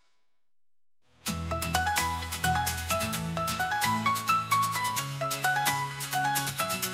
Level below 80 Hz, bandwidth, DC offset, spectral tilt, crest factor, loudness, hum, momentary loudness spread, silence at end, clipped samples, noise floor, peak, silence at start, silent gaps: -52 dBFS; 16 kHz; under 0.1%; -3 dB/octave; 18 dB; -29 LUFS; none; 5 LU; 0 s; under 0.1%; -84 dBFS; -12 dBFS; 1.25 s; none